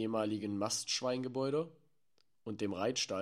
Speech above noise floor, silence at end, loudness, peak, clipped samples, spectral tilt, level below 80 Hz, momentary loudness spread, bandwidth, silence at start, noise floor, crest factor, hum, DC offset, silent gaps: 43 dB; 0 s; -36 LUFS; -20 dBFS; under 0.1%; -3.5 dB/octave; -80 dBFS; 10 LU; 14.5 kHz; 0 s; -79 dBFS; 16 dB; none; under 0.1%; none